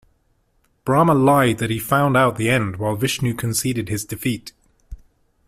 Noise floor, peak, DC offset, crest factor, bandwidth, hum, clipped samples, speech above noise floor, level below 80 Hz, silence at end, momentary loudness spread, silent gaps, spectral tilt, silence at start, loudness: -64 dBFS; -2 dBFS; under 0.1%; 18 dB; 16 kHz; none; under 0.1%; 45 dB; -48 dBFS; 0.5 s; 10 LU; none; -5.5 dB/octave; 0.85 s; -19 LUFS